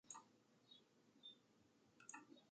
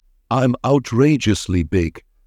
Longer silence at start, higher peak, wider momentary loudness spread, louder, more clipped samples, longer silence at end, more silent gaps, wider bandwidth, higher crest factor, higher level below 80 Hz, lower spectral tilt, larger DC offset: second, 0.05 s vs 0.3 s; second, -40 dBFS vs -4 dBFS; about the same, 8 LU vs 6 LU; second, -63 LUFS vs -18 LUFS; neither; second, 0 s vs 0.3 s; neither; second, 8.8 kHz vs 13.5 kHz; first, 26 dB vs 14 dB; second, under -90 dBFS vs -40 dBFS; second, -1 dB/octave vs -6.5 dB/octave; neither